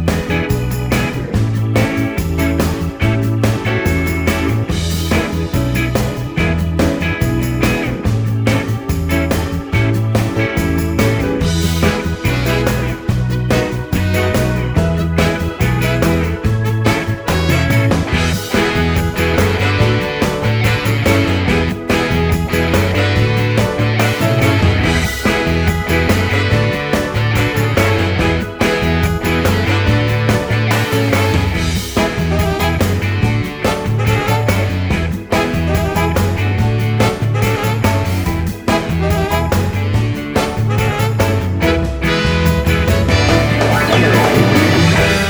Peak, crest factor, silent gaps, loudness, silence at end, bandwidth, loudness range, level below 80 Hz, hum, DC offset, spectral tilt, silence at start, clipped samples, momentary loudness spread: 0 dBFS; 14 dB; none; -15 LUFS; 0 s; over 20 kHz; 2 LU; -26 dBFS; none; under 0.1%; -6 dB/octave; 0 s; under 0.1%; 4 LU